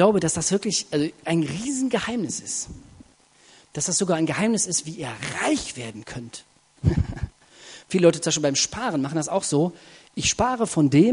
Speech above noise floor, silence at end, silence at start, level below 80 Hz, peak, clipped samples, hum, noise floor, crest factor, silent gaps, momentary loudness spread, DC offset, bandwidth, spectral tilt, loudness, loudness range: 33 dB; 0 s; 0 s; -44 dBFS; -4 dBFS; under 0.1%; none; -55 dBFS; 20 dB; none; 17 LU; under 0.1%; 11 kHz; -4 dB/octave; -23 LUFS; 4 LU